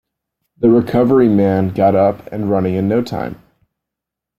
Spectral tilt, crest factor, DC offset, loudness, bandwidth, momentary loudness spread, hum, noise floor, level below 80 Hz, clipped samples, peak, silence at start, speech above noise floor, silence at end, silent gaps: -9.5 dB/octave; 14 dB; under 0.1%; -15 LUFS; 14 kHz; 11 LU; none; -83 dBFS; -50 dBFS; under 0.1%; -2 dBFS; 0.6 s; 69 dB; 1.05 s; none